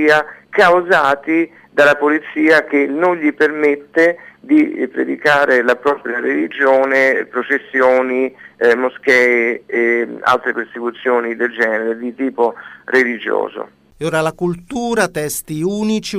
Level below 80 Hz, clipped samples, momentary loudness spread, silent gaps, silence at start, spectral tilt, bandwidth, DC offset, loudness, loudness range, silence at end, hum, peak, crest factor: -56 dBFS; under 0.1%; 9 LU; none; 0 s; -4.5 dB/octave; 15.5 kHz; under 0.1%; -15 LUFS; 5 LU; 0 s; none; -2 dBFS; 14 dB